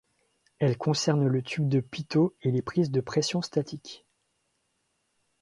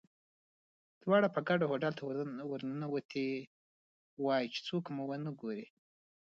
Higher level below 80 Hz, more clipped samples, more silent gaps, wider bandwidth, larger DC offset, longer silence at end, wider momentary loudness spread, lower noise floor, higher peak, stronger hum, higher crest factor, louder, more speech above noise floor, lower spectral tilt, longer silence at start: first, -66 dBFS vs -84 dBFS; neither; second, none vs 3.05-3.09 s, 3.47-4.17 s; first, 11.5 kHz vs 7.6 kHz; neither; first, 1.45 s vs 0.55 s; second, 9 LU vs 12 LU; second, -75 dBFS vs under -90 dBFS; first, -10 dBFS vs -16 dBFS; neither; about the same, 18 dB vs 22 dB; first, -27 LUFS vs -36 LUFS; second, 49 dB vs over 55 dB; about the same, -6 dB/octave vs -5 dB/octave; second, 0.6 s vs 1.05 s